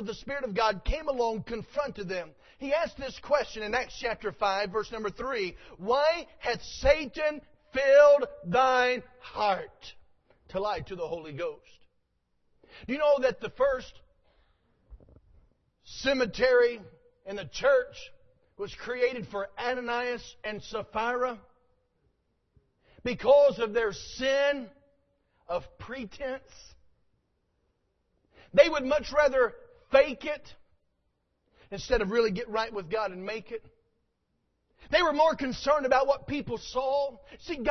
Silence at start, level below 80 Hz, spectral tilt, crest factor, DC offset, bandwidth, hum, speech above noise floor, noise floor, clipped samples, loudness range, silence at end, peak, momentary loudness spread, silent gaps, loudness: 0 s; -50 dBFS; -4.5 dB/octave; 24 dB; under 0.1%; 6.4 kHz; none; 49 dB; -77 dBFS; under 0.1%; 9 LU; 0 s; -6 dBFS; 16 LU; none; -28 LUFS